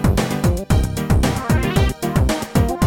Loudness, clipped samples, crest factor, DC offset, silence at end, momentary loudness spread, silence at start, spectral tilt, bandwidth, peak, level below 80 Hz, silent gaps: -19 LUFS; under 0.1%; 14 dB; under 0.1%; 0 s; 1 LU; 0 s; -6 dB/octave; 17 kHz; -2 dBFS; -24 dBFS; none